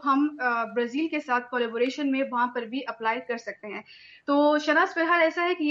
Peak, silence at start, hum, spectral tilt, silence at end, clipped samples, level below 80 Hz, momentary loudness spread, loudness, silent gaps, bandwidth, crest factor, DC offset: -10 dBFS; 0 s; none; -4 dB/octave; 0 s; under 0.1%; -80 dBFS; 12 LU; -25 LUFS; none; 7.4 kHz; 16 dB; under 0.1%